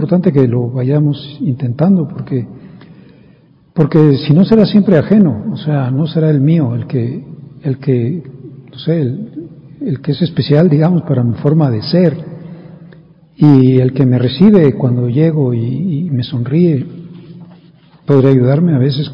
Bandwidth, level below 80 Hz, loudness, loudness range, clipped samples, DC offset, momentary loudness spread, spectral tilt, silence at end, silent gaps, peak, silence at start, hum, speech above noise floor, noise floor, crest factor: 5.4 kHz; -48 dBFS; -12 LUFS; 6 LU; 0.7%; under 0.1%; 16 LU; -11 dB/octave; 0 s; none; 0 dBFS; 0 s; none; 35 dB; -46 dBFS; 12 dB